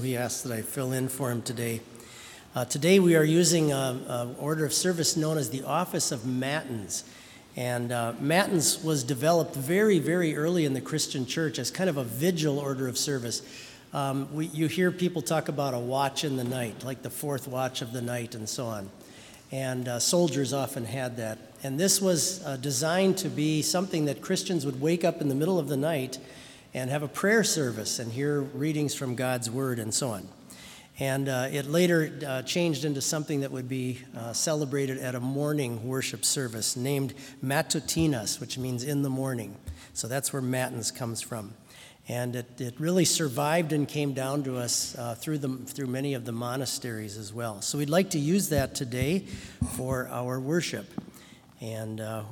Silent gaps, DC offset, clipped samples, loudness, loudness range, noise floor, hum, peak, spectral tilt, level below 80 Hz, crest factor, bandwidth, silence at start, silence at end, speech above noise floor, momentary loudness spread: none; under 0.1%; under 0.1%; -28 LUFS; 6 LU; -52 dBFS; none; -8 dBFS; -4.5 dB/octave; -60 dBFS; 22 dB; 18 kHz; 0 s; 0 s; 24 dB; 13 LU